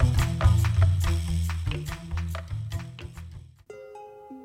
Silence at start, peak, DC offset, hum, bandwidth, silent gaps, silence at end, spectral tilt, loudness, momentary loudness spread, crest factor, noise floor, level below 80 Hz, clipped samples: 0 s; -8 dBFS; under 0.1%; none; 15 kHz; none; 0 s; -6 dB/octave; -27 LUFS; 22 LU; 18 dB; -46 dBFS; -32 dBFS; under 0.1%